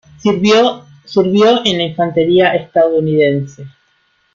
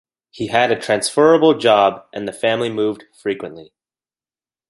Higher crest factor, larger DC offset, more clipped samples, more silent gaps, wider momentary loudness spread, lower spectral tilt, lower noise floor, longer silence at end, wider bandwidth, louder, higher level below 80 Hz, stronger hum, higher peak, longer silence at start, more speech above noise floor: second, 12 dB vs 18 dB; neither; neither; neither; second, 7 LU vs 15 LU; first, -5.5 dB/octave vs -4 dB/octave; second, -58 dBFS vs under -90 dBFS; second, 0.65 s vs 1.05 s; second, 7.6 kHz vs 11.5 kHz; first, -13 LUFS vs -16 LUFS; first, -54 dBFS vs -60 dBFS; neither; about the same, 0 dBFS vs 0 dBFS; about the same, 0.25 s vs 0.35 s; second, 46 dB vs over 73 dB